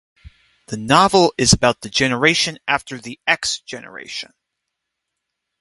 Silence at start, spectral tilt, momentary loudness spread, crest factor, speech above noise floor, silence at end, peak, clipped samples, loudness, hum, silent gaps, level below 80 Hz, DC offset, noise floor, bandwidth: 0.25 s; -3 dB/octave; 18 LU; 20 dB; 61 dB; 1.35 s; 0 dBFS; under 0.1%; -16 LUFS; none; none; -44 dBFS; under 0.1%; -79 dBFS; 11.5 kHz